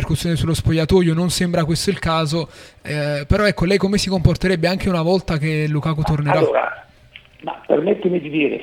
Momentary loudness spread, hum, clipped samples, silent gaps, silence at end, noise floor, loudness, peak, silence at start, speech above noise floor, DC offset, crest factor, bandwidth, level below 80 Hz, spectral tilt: 9 LU; none; under 0.1%; none; 0 s; -45 dBFS; -18 LUFS; 0 dBFS; 0 s; 27 dB; under 0.1%; 18 dB; 16 kHz; -34 dBFS; -6 dB/octave